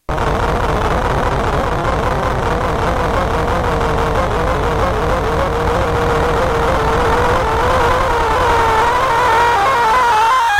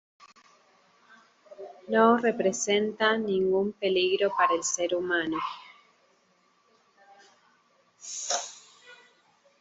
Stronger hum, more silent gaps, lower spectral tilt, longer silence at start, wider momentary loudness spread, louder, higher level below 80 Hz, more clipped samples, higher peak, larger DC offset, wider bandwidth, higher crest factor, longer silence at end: neither; neither; first, -5.5 dB/octave vs -3 dB/octave; second, 0.1 s vs 1.5 s; second, 5 LU vs 22 LU; first, -15 LUFS vs -26 LUFS; first, -24 dBFS vs -72 dBFS; neither; first, -2 dBFS vs -8 dBFS; neither; first, 16 kHz vs 8.2 kHz; second, 12 dB vs 20 dB; second, 0 s vs 0.65 s